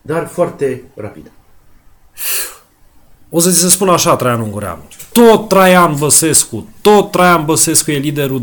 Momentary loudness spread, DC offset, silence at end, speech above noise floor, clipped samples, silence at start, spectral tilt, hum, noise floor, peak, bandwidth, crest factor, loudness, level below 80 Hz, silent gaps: 16 LU; under 0.1%; 0 s; 34 dB; under 0.1%; 0.05 s; -3.5 dB/octave; none; -45 dBFS; 0 dBFS; over 20 kHz; 12 dB; -11 LUFS; -46 dBFS; none